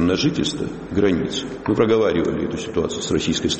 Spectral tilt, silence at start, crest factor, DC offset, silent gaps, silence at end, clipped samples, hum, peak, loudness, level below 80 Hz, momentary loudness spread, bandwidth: -5 dB/octave; 0 s; 16 dB; under 0.1%; none; 0 s; under 0.1%; none; -4 dBFS; -21 LUFS; -42 dBFS; 8 LU; 8.8 kHz